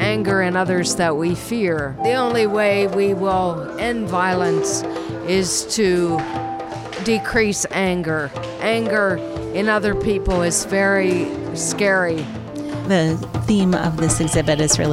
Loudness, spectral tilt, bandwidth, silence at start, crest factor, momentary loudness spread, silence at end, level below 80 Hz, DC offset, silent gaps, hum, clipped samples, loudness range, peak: -19 LUFS; -4.5 dB/octave; 16 kHz; 0 s; 18 dB; 8 LU; 0 s; -40 dBFS; under 0.1%; none; none; under 0.1%; 2 LU; -2 dBFS